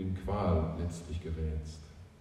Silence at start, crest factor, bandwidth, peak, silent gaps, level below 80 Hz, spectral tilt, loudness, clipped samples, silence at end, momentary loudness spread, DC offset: 0 s; 16 dB; 10.5 kHz; -18 dBFS; none; -44 dBFS; -8 dB/octave; -35 LUFS; under 0.1%; 0 s; 17 LU; under 0.1%